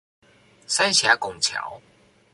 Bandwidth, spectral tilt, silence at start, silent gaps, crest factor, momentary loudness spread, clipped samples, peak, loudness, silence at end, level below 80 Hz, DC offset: 11.5 kHz; 0 dB/octave; 0.7 s; none; 22 dB; 13 LU; under 0.1%; -4 dBFS; -20 LUFS; 0.55 s; -64 dBFS; under 0.1%